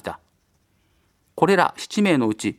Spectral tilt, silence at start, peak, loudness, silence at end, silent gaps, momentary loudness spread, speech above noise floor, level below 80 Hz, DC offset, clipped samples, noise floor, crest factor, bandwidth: -5.5 dB/octave; 0.05 s; -2 dBFS; -20 LUFS; 0.05 s; none; 22 LU; 46 dB; -62 dBFS; under 0.1%; under 0.1%; -65 dBFS; 22 dB; 13.5 kHz